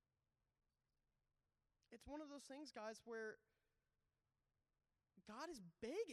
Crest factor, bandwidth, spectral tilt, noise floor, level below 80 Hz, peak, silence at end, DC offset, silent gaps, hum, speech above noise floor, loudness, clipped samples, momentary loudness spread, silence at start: 20 dB; 13 kHz; -4 dB/octave; under -90 dBFS; -82 dBFS; -38 dBFS; 0 s; under 0.1%; none; none; over 36 dB; -55 LUFS; under 0.1%; 14 LU; 1.9 s